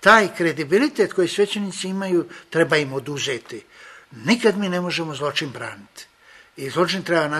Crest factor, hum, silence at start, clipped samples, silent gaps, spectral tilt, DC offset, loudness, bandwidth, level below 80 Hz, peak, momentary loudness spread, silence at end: 22 dB; none; 0 s; under 0.1%; none; -4.5 dB/octave; under 0.1%; -21 LUFS; 13.5 kHz; -64 dBFS; 0 dBFS; 15 LU; 0 s